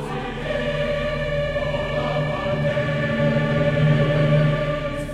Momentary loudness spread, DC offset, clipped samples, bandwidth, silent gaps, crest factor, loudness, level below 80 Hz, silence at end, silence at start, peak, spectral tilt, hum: 7 LU; under 0.1%; under 0.1%; 9.4 kHz; none; 14 dB; -22 LUFS; -36 dBFS; 0 s; 0 s; -8 dBFS; -7.5 dB/octave; none